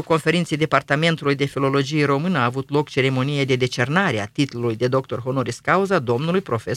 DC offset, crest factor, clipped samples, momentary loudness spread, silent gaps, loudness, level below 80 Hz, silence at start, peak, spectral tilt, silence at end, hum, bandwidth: under 0.1%; 20 dB; under 0.1%; 4 LU; none; -20 LUFS; -58 dBFS; 0 s; 0 dBFS; -6 dB/octave; 0 s; none; 14 kHz